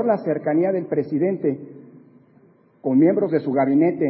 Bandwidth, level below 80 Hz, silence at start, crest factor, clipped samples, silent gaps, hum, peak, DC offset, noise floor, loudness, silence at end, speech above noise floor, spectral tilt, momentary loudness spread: 5.6 kHz; -72 dBFS; 0 s; 14 dB; under 0.1%; none; none; -6 dBFS; under 0.1%; -54 dBFS; -20 LUFS; 0 s; 35 dB; -13.5 dB/octave; 9 LU